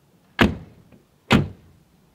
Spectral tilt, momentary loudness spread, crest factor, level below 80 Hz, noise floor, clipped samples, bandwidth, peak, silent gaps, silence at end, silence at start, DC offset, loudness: -6 dB/octave; 15 LU; 24 dB; -40 dBFS; -55 dBFS; under 0.1%; 15.5 kHz; 0 dBFS; none; 0.6 s; 0.4 s; under 0.1%; -21 LUFS